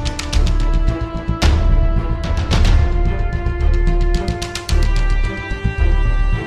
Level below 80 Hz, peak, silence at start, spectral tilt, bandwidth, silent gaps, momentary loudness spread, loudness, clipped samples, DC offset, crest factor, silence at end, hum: -16 dBFS; -2 dBFS; 0 s; -5.5 dB/octave; 11 kHz; none; 6 LU; -19 LUFS; under 0.1%; 0.6%; 12 dB; 0 s; none